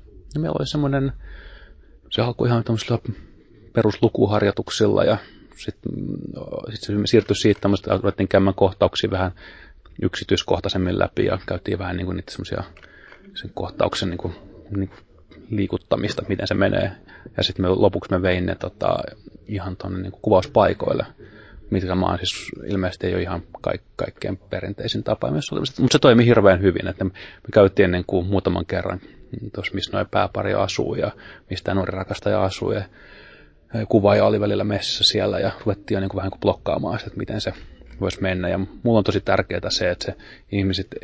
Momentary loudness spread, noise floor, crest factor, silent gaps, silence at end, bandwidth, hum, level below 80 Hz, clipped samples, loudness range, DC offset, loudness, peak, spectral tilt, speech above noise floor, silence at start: 14 LU; -48 dBFS; 20 dB; none; 0.05 s; 8 kHz; none; -40 dBFS; under 0.1%; 7 LU; under 0.1%; -22 LUFS; -2 dBFS; -6 dB/octave; 27 dB; 0.15 s